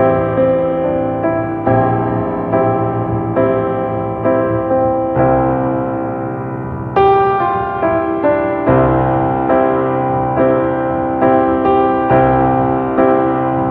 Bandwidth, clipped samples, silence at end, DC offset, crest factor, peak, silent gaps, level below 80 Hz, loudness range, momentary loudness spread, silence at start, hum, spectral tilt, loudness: 4.3 kHz; under 0.1%; 0 s; under 0.1%; 14 dB; 0 dBFS; none; -36 dBFS; 2 LU; 6 LU; 0 s; none; -11 dB/octave; -14 LUFS